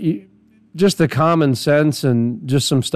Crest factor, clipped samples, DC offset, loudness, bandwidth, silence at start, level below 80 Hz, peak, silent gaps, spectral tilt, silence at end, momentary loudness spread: 14 dB; under 0.1%; under 0.1%; -17 LUFS; 14 kHz; 0 s; -56 dBFS; -4 dBFS; none; -6 dB/octave; 0 s; 4 LU